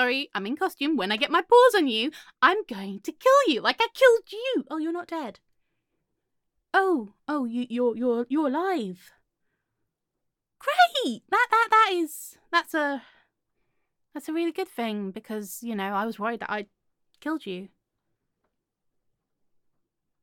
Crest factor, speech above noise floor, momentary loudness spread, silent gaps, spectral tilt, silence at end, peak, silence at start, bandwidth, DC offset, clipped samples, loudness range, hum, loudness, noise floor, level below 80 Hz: 22 dB; 57 dB; 15 LU; none; -3.5 dB/octave; 2.55 s; -6 dBFS; 0 s; 17.5 kHz; under 0.1%; under 0.1%; 11 LU; none; -25 LUFS; -82 dBFS; -78 dBFS